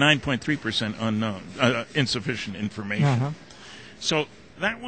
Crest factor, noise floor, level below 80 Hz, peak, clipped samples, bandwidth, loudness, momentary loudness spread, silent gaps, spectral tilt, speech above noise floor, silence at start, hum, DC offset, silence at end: 20 dB; -45 dBFS; -56 dBFS; -6 dBFS; under 0.1%; 9.2 kHz; -26 LUFS; 11 LU; none; -5 dB/octave; 20 dB; 0 s; none; 0.2%; 0 s